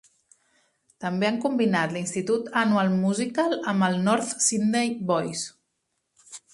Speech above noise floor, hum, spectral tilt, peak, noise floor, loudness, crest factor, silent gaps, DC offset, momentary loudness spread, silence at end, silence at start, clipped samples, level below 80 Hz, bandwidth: 53 dB; none; -4.5 dB/octave; -8 dBFS; -77 dBFS; -24 LUFS; 18 dB; none; under 0.1%; 9 LU; 0.15 s; 1 s; under 0.1%; -68 dBFS; 11.5 kHz